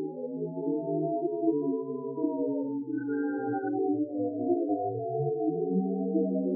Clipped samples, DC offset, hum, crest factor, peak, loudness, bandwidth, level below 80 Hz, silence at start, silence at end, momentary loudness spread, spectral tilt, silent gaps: under 0.1%; under 0.1%; none; 14 dB; -14 dBFS; -31 LUFS; 1.7 kHz; under -90 dBFS; 0 s; 0 s; 5 LU; -14.5 dB/octave; none